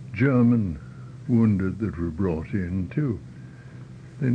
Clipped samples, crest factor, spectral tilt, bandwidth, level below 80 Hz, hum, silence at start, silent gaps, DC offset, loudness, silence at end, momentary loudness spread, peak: under 0.1%; 16 dB; -10 dB/octave; 6.2 kHz; -46 dBFS; none; 0 s; none; under 0.1%; -24 LUFS; 0 s; 23 LU; -10 dBFS